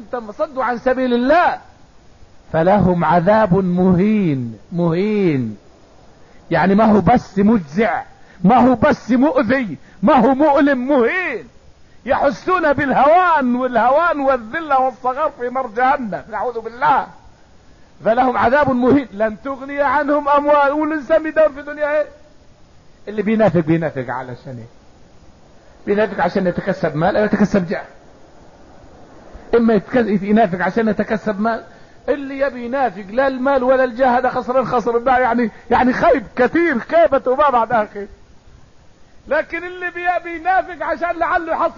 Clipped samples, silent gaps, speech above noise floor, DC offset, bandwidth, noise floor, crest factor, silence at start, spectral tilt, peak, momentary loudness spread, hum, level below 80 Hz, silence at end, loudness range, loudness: under 0.1%; none; 31 dB; 0.3%; 7.2 kHz; -46 dBFS; 12 dB; 0 s; -8 dB/octave; -4 dBFS; 11 LU; none; -44 dBFS; 0.05 s; 5 LU; -16 LUFS